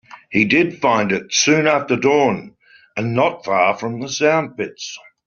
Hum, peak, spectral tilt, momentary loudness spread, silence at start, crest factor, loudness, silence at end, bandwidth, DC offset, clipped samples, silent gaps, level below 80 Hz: none; -2 dBFS; -3.5 dB/octave; 12 LU; 0.1 s; 16 dB; -17 LUFS; 0.3 s; 7.4 kHz; under 0.1%; under 0.1%; none; -58 dBFS